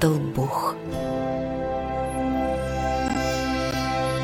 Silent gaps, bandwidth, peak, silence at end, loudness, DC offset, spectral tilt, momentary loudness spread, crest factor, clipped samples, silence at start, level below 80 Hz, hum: none; 16.5 kHz; -8 dBFS; 0 s; -26 LUFS; under 0.1%; -6 dB/octave; 3 LU; 18 dB; under 0.1%; 0 s; -38 dBFS; none